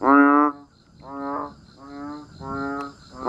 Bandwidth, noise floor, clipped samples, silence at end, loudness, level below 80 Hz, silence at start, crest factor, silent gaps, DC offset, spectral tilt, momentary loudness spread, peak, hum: 7.8 kHz; -48 dBFS; under 0.1%; 0 s; -22 LUFS; -56 dBFS; 0 s; 20 dB; none; under 0.1%; -7 dB/octave; 23 LU; -4 dBFS; none